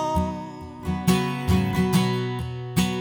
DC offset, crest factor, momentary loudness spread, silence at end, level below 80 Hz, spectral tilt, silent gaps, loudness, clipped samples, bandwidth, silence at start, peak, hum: under 0.1%; 16 dB; 11 LU; 0 s; -42 dBFS; -6 dB/octave; none; -24 LUFS; under 0.1%; over 20 kHz; 0 s; -8 dBFS; none